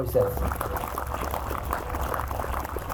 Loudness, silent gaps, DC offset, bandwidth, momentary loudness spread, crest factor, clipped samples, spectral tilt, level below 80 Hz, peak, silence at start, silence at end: -30 LUFS; none; under 0.1%; over 20 kHz; 6 LU; 18 dB; under 0.1%; -5.5 dB/octave; -34 dBFS; -10 dBFS; 0 s; 0 s